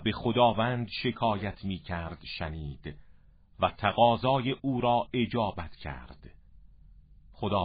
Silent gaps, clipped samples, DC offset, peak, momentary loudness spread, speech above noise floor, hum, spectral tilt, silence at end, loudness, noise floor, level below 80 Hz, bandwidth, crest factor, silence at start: none; under 0.1%; under 0.1%; -10 dBFS; 16 LU; 27 dB; none; -10 dB/octave; 0 s; -29 LUFS; -56 dBFS; -50 dBFS; 5 kHz; 20 dB; 0 s